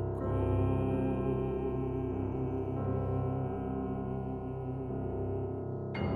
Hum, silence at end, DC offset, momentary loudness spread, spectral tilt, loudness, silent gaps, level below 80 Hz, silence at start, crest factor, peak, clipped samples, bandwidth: none; 0 s; under 0.1%; 7 LU; -11 dB/octave; -35 LUFS; none; -44 dBFS; 0 s; 14 dB; -20 dBFS; under 0.1%; 4.8 kHz